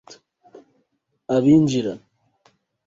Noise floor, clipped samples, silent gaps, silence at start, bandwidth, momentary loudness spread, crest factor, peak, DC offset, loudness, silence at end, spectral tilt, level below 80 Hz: -71 dBFS; under 0.1%; none; 0.1 s; 7.8 kHz; 24 LU; 18 dB; -4 dBFS; under 0.1%; -19 LUFS; 0.9 s; -7 dB/octave; -58 dBFS